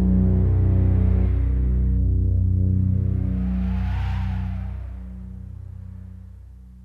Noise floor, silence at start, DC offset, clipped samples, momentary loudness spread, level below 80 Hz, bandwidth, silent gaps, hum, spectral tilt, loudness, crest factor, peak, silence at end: -42 dBFS; 0 s; under 0.1%; under 0.1%; 18 LU; -24 dBFS; 3.6 kHz; none; none; -11 dB/octave; -22 LUFS; 12 dB; -10 dBFS; 0 s